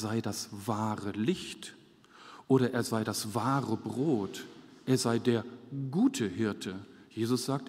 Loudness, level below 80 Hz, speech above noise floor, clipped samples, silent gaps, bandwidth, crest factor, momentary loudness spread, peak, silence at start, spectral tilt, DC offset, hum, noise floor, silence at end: -32 LUFS; -72 dBFS; 24 dB; under 0.1%; none; 16 kHz; 20 dB; 16 LU; -12 dBFS; 0 s; -5.5 dB/octave; under 0.1%; none; -56 dBFS; 0 s